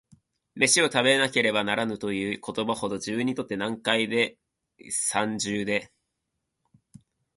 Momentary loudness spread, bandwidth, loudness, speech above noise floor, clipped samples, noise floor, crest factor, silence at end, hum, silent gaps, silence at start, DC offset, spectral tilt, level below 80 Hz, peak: 10 LU; 12 kHz; -25 LUFS; 55 dB; under 0.1%; -81 dBFS; 22 dB; 1.5 s; none; none; 0.55 s; under 0.1%; -2.5 dB/octave; -64 dBFS; -4 dBFS